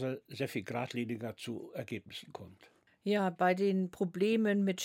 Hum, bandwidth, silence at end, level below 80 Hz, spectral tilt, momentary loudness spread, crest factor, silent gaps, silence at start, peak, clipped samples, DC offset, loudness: none; 16.5 kHz; 0 s; -80 dBFS; -6 dB/octave; 16 LU; 18 dB; none; 0 s; -18 dBFS; under 0.1%; under 0.1%; -34 LUFS